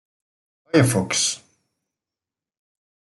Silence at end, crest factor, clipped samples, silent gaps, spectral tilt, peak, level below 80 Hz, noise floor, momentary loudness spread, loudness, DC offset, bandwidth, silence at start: 1.7 s; 22 dB; under 0.1%; none; -4 dB/octave; -4 dBFS; -62 dBFS; -89 dBFS; 6 LU; -20 LUFS; under 0.1%; 12.5 kHz; 0.75 s